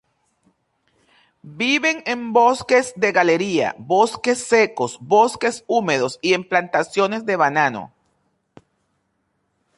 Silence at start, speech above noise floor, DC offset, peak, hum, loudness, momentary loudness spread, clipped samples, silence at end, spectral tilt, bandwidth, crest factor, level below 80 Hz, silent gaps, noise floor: 1.45 s; 51 dB; under 0.1%; -2 dBFS; none; -19 LUFS; 6 LU; under 0.1%; 1.9 s; -4 dB/octave; 11.5 kHz; 18 dB; -64 dBFS; none; -70 dBFS